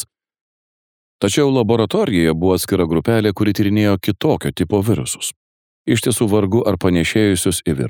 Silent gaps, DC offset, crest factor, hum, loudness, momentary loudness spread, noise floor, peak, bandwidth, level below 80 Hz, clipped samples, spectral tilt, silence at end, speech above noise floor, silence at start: 0.41-1.19 s, 5.36-5.85 s; under 0.1%; 16 dB; none; -17 LUFS; 5 LU; under -90 dBFS; -2 dBFS; 19.5 kHz; -42 dBFS; under 0.1%; -5.5 dB/octave; 0 s; over 74 dB; 0 s